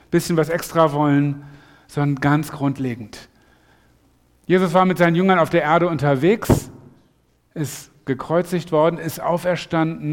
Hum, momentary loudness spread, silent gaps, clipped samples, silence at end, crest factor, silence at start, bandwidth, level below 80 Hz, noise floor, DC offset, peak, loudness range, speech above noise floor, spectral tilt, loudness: none; 13 LU; none; under 0.1%; 0 s; 18 dB; 0.1 s; 17.5 kHz; -46 dBFS; -60 dBFS; under 0.1%; -2 dBFS; 5 LU; 42 dB; -6.5 dB/octave; -19 LUFS